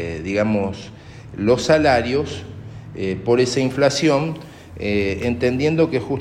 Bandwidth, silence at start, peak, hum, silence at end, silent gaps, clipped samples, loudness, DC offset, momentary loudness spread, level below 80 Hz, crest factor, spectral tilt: 13.5 kHz; 0 s; -4 dBFS; none; 0 s; none; under 0.1%; -19 LUFS; under 0.1%; 19 LU; -44 dBFS; 16 dB; -5.5 dB/octave